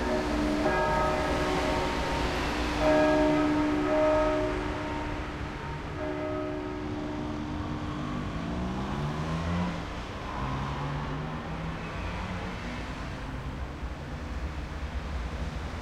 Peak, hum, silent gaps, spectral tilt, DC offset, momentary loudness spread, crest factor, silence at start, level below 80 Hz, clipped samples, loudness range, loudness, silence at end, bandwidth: -12 dBFS; none; none; -6 dB/octave; under 0.1%; 12 LU; 16 dB; 0 s; -40 dBFS; under 0.1%; 10 LU; -31 LUFS; 0 s; 14 kHz